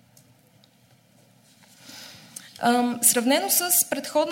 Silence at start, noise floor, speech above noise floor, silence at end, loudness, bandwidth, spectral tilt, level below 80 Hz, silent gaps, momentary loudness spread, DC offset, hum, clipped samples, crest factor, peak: 1.9 s; -59 dBFS; 37 dB; 0 s; -20 LUFS; 16.5 kHz; -1.5 dB/octave; -78 dBFS; none; 23 LU; under 0.1%; none; under 0.1%; 20 dB; -6 dBFS